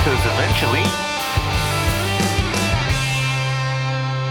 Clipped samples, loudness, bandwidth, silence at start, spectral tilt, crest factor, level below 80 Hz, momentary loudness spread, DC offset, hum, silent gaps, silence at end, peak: under 0.1%; -19 LUFS; 19.5 kHz; 0 s; -4.5 dB/octave; 14 dB; -30 dBFS; 4 LU; under 0.1%; none; none; 0 s; -4 dBFS